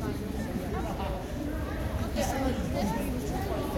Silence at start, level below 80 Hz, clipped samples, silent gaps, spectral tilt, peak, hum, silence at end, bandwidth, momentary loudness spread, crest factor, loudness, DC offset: 0 s; -38 dBFS; under 0.1%; none; -6 dB/octave; -18 dBFS; none; 0 s; 16.5 kHz; 4 LU; 14 dB; -32 LUFS; under 0.1%